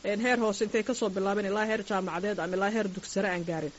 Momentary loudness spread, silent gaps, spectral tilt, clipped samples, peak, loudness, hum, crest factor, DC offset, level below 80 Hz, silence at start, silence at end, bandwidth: 5 LU; none; -4 dB/octave; under 0.1%; -14 dBFS; -29 LUFS; none; 16 dB; under 0.1%; -62 dBFS; 0.05 s; 0 s; 8 kHz